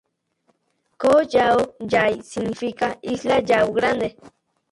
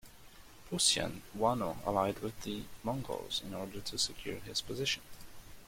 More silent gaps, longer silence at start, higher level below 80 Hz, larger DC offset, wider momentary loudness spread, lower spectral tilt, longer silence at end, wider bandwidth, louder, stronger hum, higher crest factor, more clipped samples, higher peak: neither; first, 1 s vs 0.05 s; about the same, -54 dBFS vs -56 dBFS; neither; second, 9 LU vs 13 LU; first, -5 dB/octave vs -3 dB/octave; first, 0.45 s vs 0 s; second, 11.5 kHz vs 16.5 kHz; first, -20 LUFS vs -35 LUFS; neither; second, 16 dB vs 24 dB; neither; first, -4 dBFS vs -14 dBFS